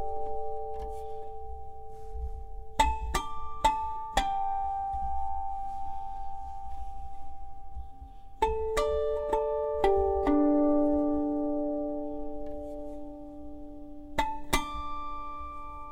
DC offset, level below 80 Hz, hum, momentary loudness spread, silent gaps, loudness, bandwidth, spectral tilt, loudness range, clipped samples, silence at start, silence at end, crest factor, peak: under 0.1%; -42 dBFS; none; 20 LU; none; -31 LUFS; 16 kHz; -5 dB/octave; 9 LU; under 0.1%; 0 s; 0 s; 22 dB; -8 dBFS